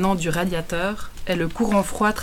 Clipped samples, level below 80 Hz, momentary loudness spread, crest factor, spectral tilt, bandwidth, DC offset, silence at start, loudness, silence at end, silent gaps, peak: under 0.1%; -38 dBFS; 6 LU; 14 dB; -5 dB/octave; 17.5 kHz; under 0.1%; 0 s; -23 LUFS; 0 s; none; -8 dBFS